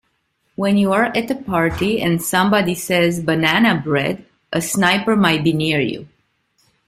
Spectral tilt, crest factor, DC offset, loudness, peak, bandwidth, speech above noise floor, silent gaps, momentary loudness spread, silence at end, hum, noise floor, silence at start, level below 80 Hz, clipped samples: -5 dB/octave; 16 dB; under 0.1%; -17 LUFS; -2 dBFS; 16 kHz; 50 dB; none; 9 LU; 0.8 s; none; -67 dBFS; 0.6 s; -48 dBFS; under 0.1%